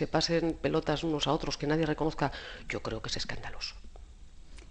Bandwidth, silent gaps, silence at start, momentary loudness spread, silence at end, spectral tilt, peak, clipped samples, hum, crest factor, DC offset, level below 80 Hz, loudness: 9.4 kHz; none; 0 s; 10 LU; 0 s; -5 dB/octave; -12 dBFS; under 0.1%; none; 20 dB; under 0.1%; -46 dBFS; -32 LUFS